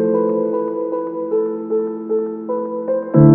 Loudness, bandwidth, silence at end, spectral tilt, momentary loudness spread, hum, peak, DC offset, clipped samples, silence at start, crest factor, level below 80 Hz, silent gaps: -20 LUFS; 2.2 kHz; 0 s; -15 dB/octave; 6 LU; none; 0 dBFS; under 0.1%; under 0.1%; 0 s; 16 dB; -50 dBFS; none